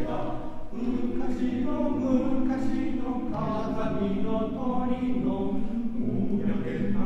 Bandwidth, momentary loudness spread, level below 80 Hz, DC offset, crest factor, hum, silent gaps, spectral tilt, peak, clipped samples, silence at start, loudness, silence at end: 6.2 kHz; 5 LU; -40 dBFS; under 0.1%; 12 dB; none; none; -8.5 dB/octave; -12 dBFS; under 0.1%; 0 s; -29 LUFS; 0 s